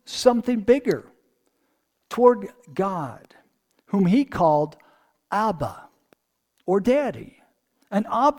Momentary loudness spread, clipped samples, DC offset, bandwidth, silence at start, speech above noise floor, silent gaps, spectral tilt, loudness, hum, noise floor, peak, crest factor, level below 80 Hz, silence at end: 13 LU; under 0.1%; under 0.1%; 16.5 kHz; 0.1 s; 50 dB; none; -6.5 dB/octave; -23 LUFS; none; -71 dBFS; -4 dBFS; 20 dB; -56 dBFS; 0 s